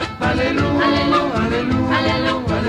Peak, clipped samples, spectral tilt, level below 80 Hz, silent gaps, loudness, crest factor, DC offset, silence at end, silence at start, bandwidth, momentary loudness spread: -6 dBFS; under 0.1%; -6.5 dB/octave; -34 dBFS; none; -17 LUFS; 12 dB; under 0.1%; 0 s; 0 s; 11 kHz; 3 LU